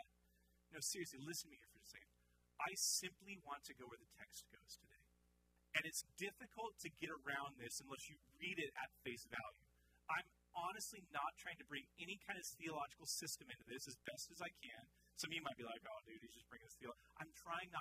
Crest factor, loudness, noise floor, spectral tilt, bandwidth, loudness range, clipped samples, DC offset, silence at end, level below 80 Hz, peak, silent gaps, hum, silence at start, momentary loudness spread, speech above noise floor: 28 dB; -49 LUFS; -79 dBFS; -1.5 dB/octave; 15.5 kHz; 5 LU; under 0.1%; under 0.1%; 0 s; -80 dBFS; -24 dBFS; none; none; 0 s; 16 LU; 27 dB